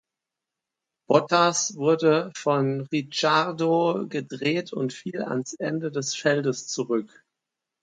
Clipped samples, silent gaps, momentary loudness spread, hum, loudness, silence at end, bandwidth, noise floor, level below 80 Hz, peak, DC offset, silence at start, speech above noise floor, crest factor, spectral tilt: under 0.1%; none; 9 LU; none; -24 LUFS; 0.75 s; 9.4 kHz; -87 dBFS; -74 dBFS; -4 dBFS; under 0.1%; 1.1 s; 62 dB; 22 dB; -4.5 dB/octave